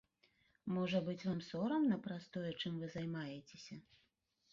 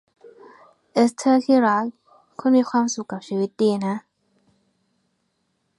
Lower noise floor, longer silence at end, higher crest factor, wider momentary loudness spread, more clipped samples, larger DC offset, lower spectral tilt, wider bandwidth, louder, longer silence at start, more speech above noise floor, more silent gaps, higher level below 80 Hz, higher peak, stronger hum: first, -80 dBFS vs -72 dBFS; second, 0.7 s vs 1.8 s; about the same, 18 dB vs 18 dB; first, 17 LU vs 12 LU; neither; neither; about the same, -5.5 dB/octave vs -5.5 dB/octave; second, 7.4 kHz vs 11.5 kHz; second, -41 LUFS vs -21 LUFS; second, 0.65 s vs 0.95 s; second, 40 dB vs 52 dB; neither; about the same, -76 dBFS vs -74 dBFS; second, -24 dBFS vs -6 dBFS; neither